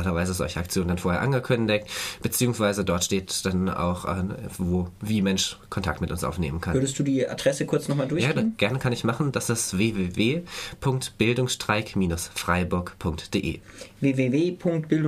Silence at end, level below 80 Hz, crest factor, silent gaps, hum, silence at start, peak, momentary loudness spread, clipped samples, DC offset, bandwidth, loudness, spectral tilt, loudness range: 0 s; -46 dBFS; 20 dB; none; none; 0 s; -6 dBFS; 6 LU; under 0.1%; under 0.1%; 15.5 kHz; -26 LUFS; -5 dB/octave; 2 LU